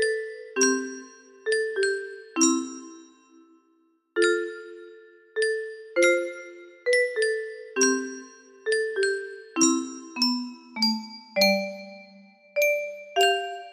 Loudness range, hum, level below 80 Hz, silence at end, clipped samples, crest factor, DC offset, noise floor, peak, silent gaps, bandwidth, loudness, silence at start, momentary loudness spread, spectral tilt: 3 LU; none; -76 dBFS; 0 s; under 0.1%; 20 dB; under 0.1%; -66 dBFS; -8 dBFS; none; 15.5 kHz; -25 LUFS; 0 s; 15 LU; -2 dB/octave